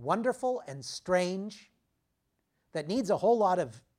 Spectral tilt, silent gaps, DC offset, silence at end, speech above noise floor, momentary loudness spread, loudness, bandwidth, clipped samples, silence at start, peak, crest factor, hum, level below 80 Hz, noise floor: -5.5 dB/octave; none; under 0.1%; 0.2 s; 49 dB; 14 LU; -30 LUFS; 14 kHz; under 0.1%; 0 s; -14 dBFS; 18 dB; none; -70 dBFS; -79 dBFS